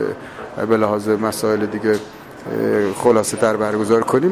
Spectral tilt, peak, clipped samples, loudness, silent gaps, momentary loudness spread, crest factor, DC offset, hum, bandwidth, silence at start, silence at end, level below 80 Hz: -5.5 dB/octave; -2 dBFS; under 0.1%; -18 LUFS; none; 12 LU; 16 dB; under 0.1%; none; 15.5 kHz; 0 s; 0 s; -54 dBFS